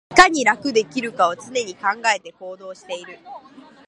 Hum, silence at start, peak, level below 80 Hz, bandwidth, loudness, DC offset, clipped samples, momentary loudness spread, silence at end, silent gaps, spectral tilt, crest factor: none; 0.1 s; 0 dBFS; -54 dBFS; 11.5 kHz; -19 LUFS; under 0.1%; under 0.1%; 24 LU; 0.5 s; none; -2 dB/octave; 20 dB